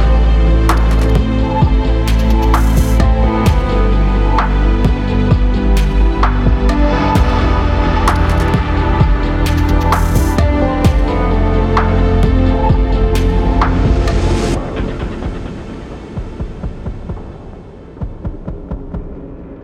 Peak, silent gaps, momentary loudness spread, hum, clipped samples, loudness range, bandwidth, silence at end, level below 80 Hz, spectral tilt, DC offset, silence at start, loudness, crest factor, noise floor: 0 dBFS; none; 14 LU; none; under 0.1%; 13 LU; 14 kHz; 0 s; -14 dBFS; -7 dB/octave; under 0.1%; 0 s; -14 LUFS; 12 dB; -32 dBFS